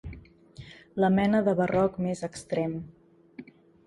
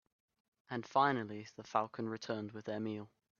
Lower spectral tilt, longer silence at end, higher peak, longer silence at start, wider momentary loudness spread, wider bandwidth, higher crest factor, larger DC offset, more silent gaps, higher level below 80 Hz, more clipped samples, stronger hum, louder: first, -7 dB/octave vs -4 dB/octave; about the same, 0.45 s vs 0.35 s; first, -10 dBFS vs -16 dBFS; second, 0.05 s vs 0.7 s; first, 25 LU vs 13 LU; first, 11.5 kHz vs 7 kHz; second, 18 dB vs 24 dB; neither; neither; first, -54 dBFS vs -84 dBFS; neither; neither; first, -27 LUFS vs -38 LUFS